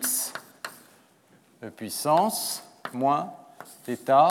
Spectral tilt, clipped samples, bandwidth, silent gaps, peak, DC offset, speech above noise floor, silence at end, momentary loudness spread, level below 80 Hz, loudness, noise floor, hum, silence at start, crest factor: -3 dB/octave; under 0.1%; 18 kHz; none; -8 dBFS; under 0.1%; 36 dB; 0 s; 20 LU; -86 dBFS; -26 LUFS; -60 dBFS; none; 0 s; 20 dB